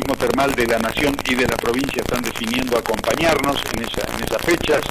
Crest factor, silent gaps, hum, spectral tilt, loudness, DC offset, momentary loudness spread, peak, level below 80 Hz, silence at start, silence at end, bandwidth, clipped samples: 14 dB; none; none; -4 dB/octave; -19 LUFS; under 0.1%; 5 LU; -4 dBFS; -36 dBFS; 0 s; 0 s; 16 kHz; under 0.1%